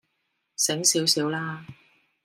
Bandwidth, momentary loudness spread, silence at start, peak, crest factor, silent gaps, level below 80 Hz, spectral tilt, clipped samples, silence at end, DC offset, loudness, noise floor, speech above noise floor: 16 kHz; 18 LU; 0.6 s; -6 dBFS; 22 dB; none; -74 dBFS; -2 dB/octave; under 0.1%; 0.5 s; under 0.1%; -23 LUFS; -76 dBFS; 51 dB